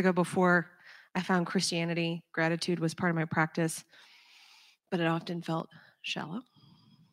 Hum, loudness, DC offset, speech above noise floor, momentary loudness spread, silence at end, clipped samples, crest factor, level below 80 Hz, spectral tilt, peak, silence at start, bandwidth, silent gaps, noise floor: none; -31 LUFS; under 0.1%; 30 dB; 13 LU; 0.7 s; under 0.1%; 20 dB; -78 dBFS; -5 dB/octave; -12 dBFS; 0 s; 15.5 kHz; none; -60 dBFS